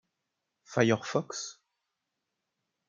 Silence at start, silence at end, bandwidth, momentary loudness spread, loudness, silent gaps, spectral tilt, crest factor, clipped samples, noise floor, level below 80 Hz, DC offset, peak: 0.7 s; 1.35 s; 9.4 kHz; 12 LU; -30 LUFS; none; -5 dB/octave; 24 dB; under 0.1%; -85 dBFS; -74 dBFS; under 0.1%; -10 dBFS